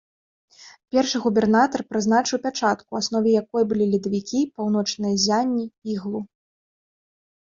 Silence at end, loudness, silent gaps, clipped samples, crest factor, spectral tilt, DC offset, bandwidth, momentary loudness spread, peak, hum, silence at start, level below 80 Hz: 1.2 s; -22 LUFS; none; under 0.1%; 18 dB; -4.5 dB/octave; under 0.1%; 7.6 kHz; 9 LU; -6 dBFS; none; 0.6 s; -62 dBFS